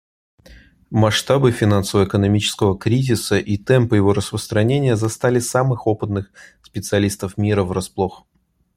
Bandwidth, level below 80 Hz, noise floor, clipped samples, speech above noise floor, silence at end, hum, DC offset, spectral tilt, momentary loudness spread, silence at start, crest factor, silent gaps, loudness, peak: 15.5 kHz; -48 dBFS; -47 dBFS; under 0.1%; 29 dB; 0.6 s; none; under 0.1%; -6 dB/octave; 8 LU; 0.5 s; 16 dB; none; -18 LUFS; -2 dBFS